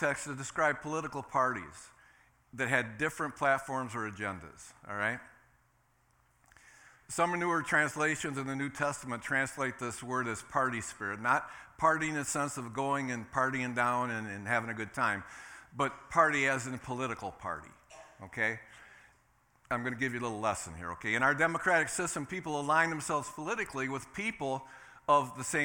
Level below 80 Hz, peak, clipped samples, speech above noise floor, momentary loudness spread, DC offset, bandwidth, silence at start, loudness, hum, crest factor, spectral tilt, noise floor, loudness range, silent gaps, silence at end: -66 dBFS; -12 dBFS; under 0.1%; 37 dB; 12 LU; under 0.1%; 18 kHz; 0 s; -33 LUFS; none; 22 dB; -4 dB/octave; -70 dBFS; 6 LU; none; 0 s